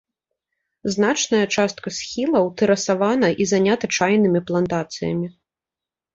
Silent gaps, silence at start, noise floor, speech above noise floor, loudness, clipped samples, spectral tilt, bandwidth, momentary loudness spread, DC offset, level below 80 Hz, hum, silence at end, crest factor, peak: none; 0.85 s; -89 dBFS; 69 dB; -20 LUFS; under 0.1%; -4.5 dB/octave; 7.8 kHz; 9 LU; under 0.1%; -58 dBFS; none; 0.85 s; 16 dB; -4 dBFS